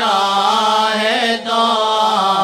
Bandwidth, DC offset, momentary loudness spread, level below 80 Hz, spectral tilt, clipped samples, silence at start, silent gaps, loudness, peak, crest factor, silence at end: 16.5 kHz; under 0.1%; 2 LU; -68 dBFS; -2.5 dB/octave; under 0.1%; 0 s; none; -14 LUFS; -2 dBFS; 12 dB; 0 s